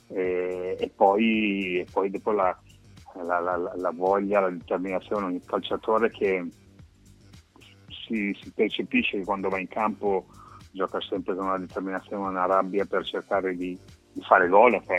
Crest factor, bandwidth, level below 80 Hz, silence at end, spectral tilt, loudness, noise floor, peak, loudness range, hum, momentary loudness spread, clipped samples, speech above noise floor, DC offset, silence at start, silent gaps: 24 dB; 11.5 kHz; -60 dBFS; 0 s; -6.5 dB/octave; -26 LUFS; -53 dBFS; -2 dBFS; 4 LU; none; 11 LU; under 0.1%; 28 dB; under 0.1%; 0.1 s; none